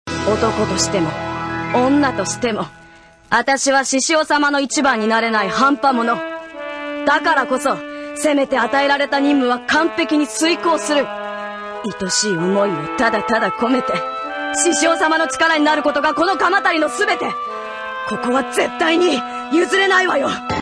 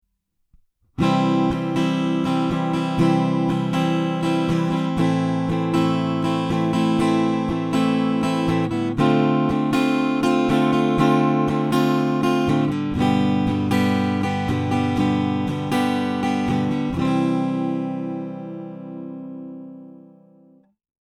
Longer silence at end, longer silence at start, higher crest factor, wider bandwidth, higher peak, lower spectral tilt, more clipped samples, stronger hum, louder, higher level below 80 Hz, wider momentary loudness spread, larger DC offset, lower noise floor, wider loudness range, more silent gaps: second, 0 s vs 1.2 s; second, 0.05 s vs 1 s; about the same, 16 dB vs 16 dB; second, 11 kHz vs 12.5 kHz; first, -2 dBFS vs -6 dBFS; second, -3 dB/octave vs -7 dB/octave; neither; neither; first, -17 LUFS vs -21 LUFS; about the same, -50 dBFS vs -48 dBFS; about the same, 10 LU vs 8 LU; neither; second, -45 dBFS vs -71 dBFS; about the same, 3 LU vs 5 LU; neither